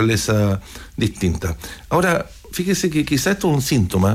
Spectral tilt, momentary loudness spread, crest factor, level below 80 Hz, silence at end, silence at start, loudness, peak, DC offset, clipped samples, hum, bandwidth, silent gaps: -5 dB/octave; 9 LU; 12 dB; -38 dBFS; 0 s; 0 s; -20 LUFS; -6 dBFS; under 0.1%; under 0.1%; none; 16 kHz; none